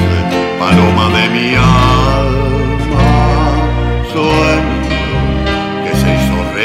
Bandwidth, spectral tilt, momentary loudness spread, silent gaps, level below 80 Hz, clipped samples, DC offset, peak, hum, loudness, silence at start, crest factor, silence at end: 15.5 kHz; -6.5 dB/octave; 6 LU; none; -18 dBFS; under 0.1%; 0.3%; 0 dBFS; none; -12 LUFS; 0 s; 10 dB; 0 s